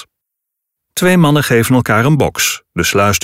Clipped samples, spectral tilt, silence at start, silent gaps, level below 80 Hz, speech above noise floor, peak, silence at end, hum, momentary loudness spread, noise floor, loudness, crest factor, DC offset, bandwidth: under 0.1%; -4.5 dB/octave; 0.95 s; none; -40 dBFS; 66 dB; -2 dBFS; 0.05 s; none; 5 LU; -78 dBFS; -12 LUFS; 12 dB; under 0.1%; 16.5 kHz